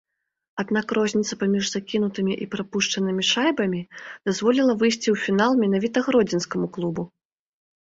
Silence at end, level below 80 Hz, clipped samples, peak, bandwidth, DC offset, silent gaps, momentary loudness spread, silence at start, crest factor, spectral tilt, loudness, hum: 0.75 s; -64 dBFS; under 0.1%; -6 dBFS; 8 kHz; under 0.1%; none; 9 LU; 0.55 s; 18 dB; -4.5 dB/octave; -23 LUFS; none